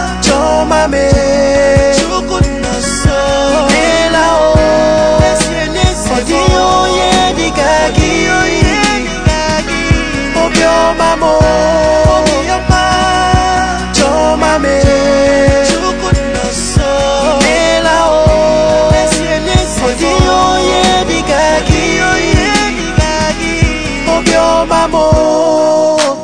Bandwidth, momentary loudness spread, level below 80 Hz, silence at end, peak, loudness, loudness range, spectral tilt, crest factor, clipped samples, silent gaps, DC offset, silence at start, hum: 10 kHz; 4 LU; -20 dBFS; 0 s; 0 dBFS; -10 LUFS; 1 LU; -4.5 dB/octave; 10 dB; under 0.1%; none; 0.9%; 0 s; none